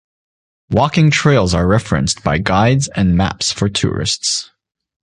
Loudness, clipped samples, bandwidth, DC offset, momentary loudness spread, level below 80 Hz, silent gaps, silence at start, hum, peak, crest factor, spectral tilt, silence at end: -15 LUFS; under 0.1%; 11 kHz; under 0.1%; 5 LU; -32 dBFS; none; 0.7 s; none; 0 dBFS; 14 dB; -5 dB/octave; 0.7 s